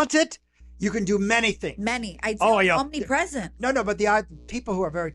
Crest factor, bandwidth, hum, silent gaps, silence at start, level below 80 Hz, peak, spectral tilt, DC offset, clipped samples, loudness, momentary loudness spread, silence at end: 16 dB; 12 kHz; none; none; 0 s; -46 dBFS; -8 dBFS; -4 dB/octave; under 0.1%; under 0.1%; -24 LUFS; 9 LU; 0 s